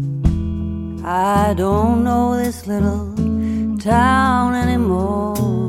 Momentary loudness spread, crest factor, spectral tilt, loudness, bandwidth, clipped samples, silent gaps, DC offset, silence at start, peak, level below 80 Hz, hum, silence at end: 8 LU; 14 dB; -7 dB/octave; -18 LUFS; 16 kHz; under 0.1%; none; 0.1%; 0 s; -2 dBFS; -28 dBFS; none; 0 s